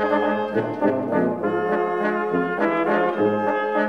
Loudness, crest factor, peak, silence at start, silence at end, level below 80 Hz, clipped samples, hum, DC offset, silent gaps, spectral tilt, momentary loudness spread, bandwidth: -22 LUFS; 14 dB; -6 dBFS; 0 s; 0 s; -68 dBFS; under 0.1%; none; 0.1%; none; -8 dB/octave; 3 LU; 6.8 kHz